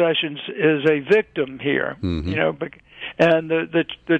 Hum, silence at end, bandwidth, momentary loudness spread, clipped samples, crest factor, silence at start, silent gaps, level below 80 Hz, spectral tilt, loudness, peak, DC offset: none; 0 s; 8 kHz; 11 LU; under 0.1%; 16 dB; 0 s; none; -46 dBFS; -7 dB/octave; -20 LUFS; -4 dBFS; under 0.1%